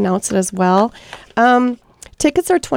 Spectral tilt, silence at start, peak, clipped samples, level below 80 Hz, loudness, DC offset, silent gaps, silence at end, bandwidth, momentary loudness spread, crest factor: -5 dB/octave; 0 s; 0 dBFS; under 0.1%; -46 dBFS; -16 LUFS; under 0.1%; none; 0 s; 16.5 kHz; 11 LU; 16 dB